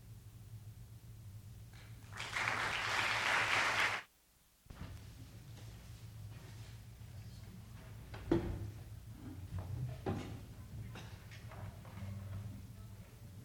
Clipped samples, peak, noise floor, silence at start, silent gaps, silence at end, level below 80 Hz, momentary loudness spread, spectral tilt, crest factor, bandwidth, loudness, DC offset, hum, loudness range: under 0.1%; -18 dBFS; -70 dBFS; 0 s; none; 0 s; -58 dBFS; 21 LU; -4 dB/octave; 24 dB; over 20 kHz; -38 LUFS; under 0.1%; none; 17 LU